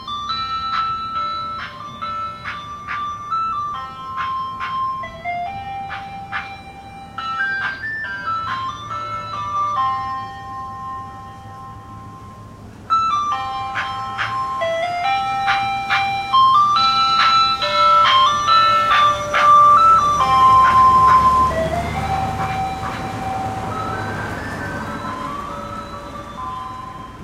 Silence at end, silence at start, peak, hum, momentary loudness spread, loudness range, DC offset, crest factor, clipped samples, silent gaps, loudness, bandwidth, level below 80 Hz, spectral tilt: 0 s; 0 s; -2 dBFS; none; 19 LU; 14 LU; under 0.1%; 16 dB; under 0.1%; none; -17 LUFS; 14.5 kHz; -42 dBFS; -3.5 dB/octave